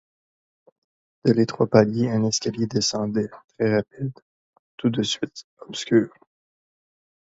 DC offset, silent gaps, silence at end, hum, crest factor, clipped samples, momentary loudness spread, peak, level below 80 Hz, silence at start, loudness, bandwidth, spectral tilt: under 0.1%; 3.44-3.48 s, 4.22-4.53 s, 4.59-4.78 s, 5.44-5.57 s; 1.15 s; none; 24 dB; under 0.1%; 14 LU; 0 dBFS; -62 dBFS; 1.25 s; -23 LUFS; 8 kHz; -5 dB/octave